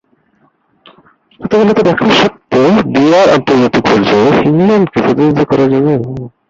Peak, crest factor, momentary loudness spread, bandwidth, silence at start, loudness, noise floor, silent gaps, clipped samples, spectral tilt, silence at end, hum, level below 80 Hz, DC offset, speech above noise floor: 0 dBFS; 10 dB; 4 LU; 7.8 kHz; 1.4 s; -9 LUFS; -54 dBFS; none; under 0.1%; -6.5 dB/octave; 0.2 s; none; -44 dBFS; under 0.1%; 45 dB